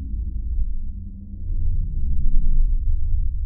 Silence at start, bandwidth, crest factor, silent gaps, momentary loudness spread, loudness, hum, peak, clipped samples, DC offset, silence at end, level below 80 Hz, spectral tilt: 0 s; 0.5 kHz; 14 dB; none; 10 LU; -28 LUFS; none; -4 dBFS; under 0.1%; under 0.1%; 0 s; -20 dBFS; -15.5 dB/octave